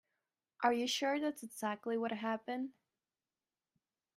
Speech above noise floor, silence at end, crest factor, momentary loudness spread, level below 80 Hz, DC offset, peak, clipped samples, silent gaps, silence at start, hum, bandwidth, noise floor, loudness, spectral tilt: over 53 dB; 1.45 s; 22 dB; 8 LU; -88 dBFS; under 0.1%; -18 dBFS; under 0.1%; none; 0.6 s; none; 15.5 kHz; under -90 dBFS; -38 LUFS; -3 dB/octave